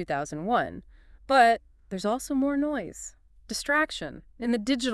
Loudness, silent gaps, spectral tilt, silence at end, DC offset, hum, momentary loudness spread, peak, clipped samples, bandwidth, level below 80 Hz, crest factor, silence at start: -27 LUFS; none; -4 dB/octave; 0 s; under 0.1%; none; 18 LU; -8 dBFS; under 0.1%; 12 kHz; -54 dBFS; 20 dB; 0 s